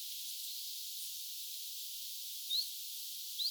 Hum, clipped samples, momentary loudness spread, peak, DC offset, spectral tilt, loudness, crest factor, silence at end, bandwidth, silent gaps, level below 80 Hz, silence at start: none; under 0.1%; 6 LU; -24 dBFS; under 0.1%; 10.5 dB/octave; -40 LUFS; 18 dB; 0 s; over 20 kHz; none; under -90 dBFS; 0 s